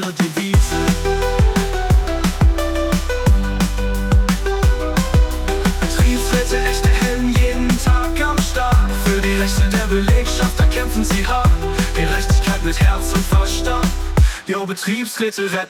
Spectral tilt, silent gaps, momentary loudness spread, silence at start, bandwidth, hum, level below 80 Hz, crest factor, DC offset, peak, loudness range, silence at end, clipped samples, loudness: -5 dB/octave; none; 4 LU; 0 s; 18 kHz; none; -18 dBFS; 12 dB; under 0.1%; -4 dBFS; 1 LU; 0 s; under 0.1%; -17 LUFS